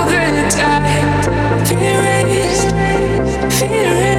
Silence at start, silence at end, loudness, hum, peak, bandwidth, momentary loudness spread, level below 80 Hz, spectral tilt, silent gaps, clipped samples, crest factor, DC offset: 0 s; 0 s; -14 LUFS; none; -2 dBFS; 17 kHz; 2 LU; -28 dBFS; -4.5 dB/octave; none; under 0.1%; 12 dB; under 0.1%